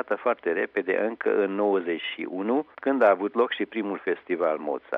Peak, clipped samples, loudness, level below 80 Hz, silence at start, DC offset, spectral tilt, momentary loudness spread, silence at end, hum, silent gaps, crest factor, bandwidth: -8 dBFS; under 0.1%; -26 LUFS; -78 dBFS; 0 s; under 0.1%; -7.5 dB/octave; 9 LU; 0 s; none; none; 18 dB; 4.9 kHz